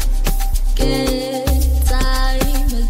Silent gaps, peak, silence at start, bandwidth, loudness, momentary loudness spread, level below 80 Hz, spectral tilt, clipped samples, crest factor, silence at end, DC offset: none; -2 dBFS; 0 s; 16.5 kHz; -19 LUFS; 4 LU; -16 dBFS; -5 dB/octave; under 0.1%; 12 dB; 0 s; under 0.1%